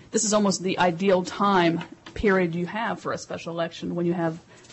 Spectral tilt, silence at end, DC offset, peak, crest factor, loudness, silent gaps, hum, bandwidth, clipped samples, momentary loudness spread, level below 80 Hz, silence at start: -4.5 dB/octave; 0 s; under 0.1%; -10 dBFS; 14 dB; -24 LUFS; none; none; 8.6 kHz; under 0.1%; 11 LU; -50 dBFS; 0.1 s